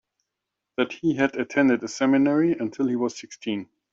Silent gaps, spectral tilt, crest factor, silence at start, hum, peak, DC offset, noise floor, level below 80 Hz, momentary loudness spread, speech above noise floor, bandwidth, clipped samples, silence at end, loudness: none; -5.5 dB/octave; 18 dB; 0.8 s; none; -6 dBFS; under 0.1%; -84 dBFS; -68 dBFS; 11 LU; 61 dB; 7.8 kHz; under 0.1%; 0.3 s; -24 LUFS